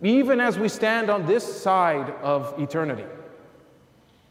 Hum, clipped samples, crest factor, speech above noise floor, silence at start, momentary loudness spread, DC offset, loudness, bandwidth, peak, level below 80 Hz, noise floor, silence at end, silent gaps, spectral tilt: none; under 0.1%; 14 dB; 34 dB; 0 s; 9 LU; under 0.1%; -23 LUFS; 16 kHz; -10 dBFS; -70 dBFS; -57 dBFS; 0.95 s; none; -5.5 dB/octave